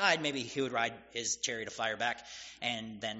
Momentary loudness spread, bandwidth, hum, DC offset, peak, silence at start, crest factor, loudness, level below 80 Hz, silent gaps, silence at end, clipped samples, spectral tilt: 6 LU; 8 kHz; none; under 0.1%; -12 dBFS; 0 s; 24 dB; -35 LUFS; -70 dBFS; none; 0 s; under 0.1%; -1 dB/octave